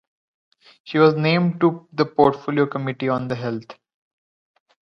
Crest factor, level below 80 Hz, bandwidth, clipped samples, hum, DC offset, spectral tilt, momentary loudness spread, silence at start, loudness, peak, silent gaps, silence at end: 20 dB; -60 dBFS; 6.4 kHz; under 0.1%; none; under 0.1%; -8.5 dB/octave; 10 LU; 0.85 s; -20 LUFS; -2 dBFS; none; 1.15 s